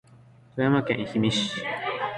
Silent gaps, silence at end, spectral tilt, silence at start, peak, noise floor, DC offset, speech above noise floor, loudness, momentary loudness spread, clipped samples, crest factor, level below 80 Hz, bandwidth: none; 0 s; -5.5 dB/octave; 0.55 s; -10 dBFS; -53 dBFS; under 0.1%; 28 dB; -26 LUFS; 6 LU; under 0.1%; 16 dB; -58 dBFS; 11 kHz